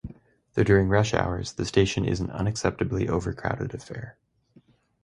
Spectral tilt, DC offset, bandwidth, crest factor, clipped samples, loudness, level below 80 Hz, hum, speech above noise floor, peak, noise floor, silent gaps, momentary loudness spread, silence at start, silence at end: -6 dB/octave; under 0.1%; 11 kHz; 22 dB; under 0.1%; -26 LUFS; -42 dBFS; none; 35 dB; -6 dBFS; -59 dBFS; none; 16 LU; 0.05 s; 0.95 s